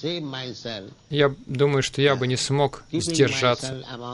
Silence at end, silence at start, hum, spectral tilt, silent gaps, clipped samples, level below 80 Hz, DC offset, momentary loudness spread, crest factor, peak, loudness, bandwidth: 0 s; 0 s; none; -4.5 dB/octave; none; under 0.1%; -54 dBFS; under 0.1%; 12 LU; 18 dB; -6 dBFS; -23 LUFS; 11.5 kHz